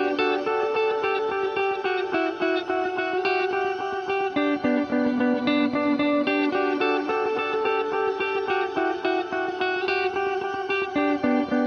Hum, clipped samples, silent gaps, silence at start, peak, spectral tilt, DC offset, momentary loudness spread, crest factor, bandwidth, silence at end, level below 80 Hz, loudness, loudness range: none; under 0.1%; none; 0 s; -10 dBFS; -5.5 dB/octave; under 0.1%; 3 LU; 14 dB; 6.6 kHz; 0 s; -62 dBFS; -24 LUFS; 2 LU